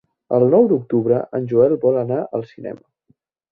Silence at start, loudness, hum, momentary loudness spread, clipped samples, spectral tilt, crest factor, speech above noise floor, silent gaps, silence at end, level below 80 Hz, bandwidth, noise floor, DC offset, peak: 0.3 s; -18 LUFS; none; 18 LU; under 0.1%; -12 dB/octave; 16 dB; 45 dB; none; 0.75 s; -62 dBFS; 4.5 kHz; -63 dBFS; under 0.1%; -2 dBFS